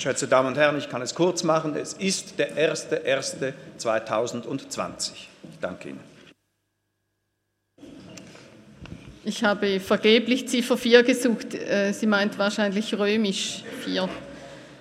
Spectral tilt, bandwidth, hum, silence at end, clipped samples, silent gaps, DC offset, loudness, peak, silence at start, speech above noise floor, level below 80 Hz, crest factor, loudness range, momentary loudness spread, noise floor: -4 dB/octave; 15.5 kHz; 50 Hz at -65 dBFS; 0 s; under 0.1%; none; under 0.1%; -24 LUFS; -2 dBFS; 0 s; 52 dB; -64 dBFS; 24 dB; 15 LU; 22 LU; -76 dBFS